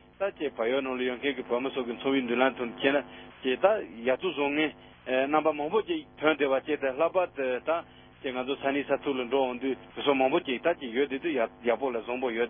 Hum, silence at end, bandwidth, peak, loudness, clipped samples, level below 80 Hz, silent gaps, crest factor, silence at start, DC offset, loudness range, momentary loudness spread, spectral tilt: none; 0 s; 3.7 kHz; -8 dBFS; -29 LUFS; under 0.1%; -64 dBFS; none; 20 dB; 0.2 s; under 0.1%; 1 LU; 7 LU; -8.5 dB/octave